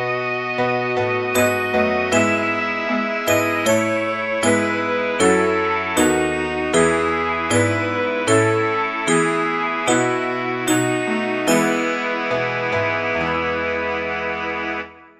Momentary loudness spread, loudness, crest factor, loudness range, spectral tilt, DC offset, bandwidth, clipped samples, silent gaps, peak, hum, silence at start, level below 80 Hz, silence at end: 5 LU; -19 LUFS; 18 dB; 2 LU; -4 dB/octave; under 0.1%; 15 kHz; under 0.1%; none; -2 dBFS; none; 0 s; -50 dBFS; 0.15 s